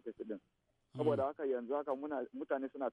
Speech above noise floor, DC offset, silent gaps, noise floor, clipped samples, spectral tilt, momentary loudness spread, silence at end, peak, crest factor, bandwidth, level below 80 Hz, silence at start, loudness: 42 dB; under 0.1%; none; -79 dBFS; under 0.1%; -9 dB/octave; 12 LU; 0 s; -22 dBFS; 18 dB; 9.4 kHz; -80 dBFS; 0.05 s; -39 LUFS